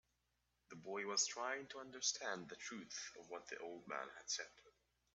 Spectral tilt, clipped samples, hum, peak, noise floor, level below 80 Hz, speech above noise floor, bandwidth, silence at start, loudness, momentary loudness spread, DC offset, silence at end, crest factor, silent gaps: -0.5 dB/octave; under 0.1%; none; -26 dBFS; -85 dBFS; -86 dBFS; 38 dB; 8.2 kHz; 0.7 s; -45 LUFS; 14 LU; under 0.1%; 0.45 s; 22 dB; none